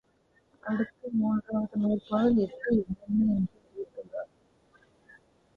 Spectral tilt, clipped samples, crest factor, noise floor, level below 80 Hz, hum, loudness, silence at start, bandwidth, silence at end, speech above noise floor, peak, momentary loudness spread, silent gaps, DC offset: -10 dB/octave; under 0.1%; 16 dB; -68 dBFS; -58 dBFS; none; -29 LUFS; 0.65 s; 4.9 kHz; 1.3 s; 40 dB; -14 dBFS; 16 LU; none; under 0.1%